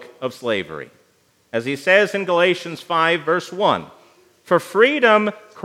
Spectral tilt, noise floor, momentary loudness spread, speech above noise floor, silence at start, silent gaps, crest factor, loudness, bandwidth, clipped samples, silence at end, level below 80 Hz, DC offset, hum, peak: -4.5 dB/octave; -60 dBFS; 12 LU; 41 dB; 0 s; none; 20 dB; -18 LUFS; 15 kHz; under 0.1%; 0 s; -72 dBFS; under 0.1%; none; 0 dBFS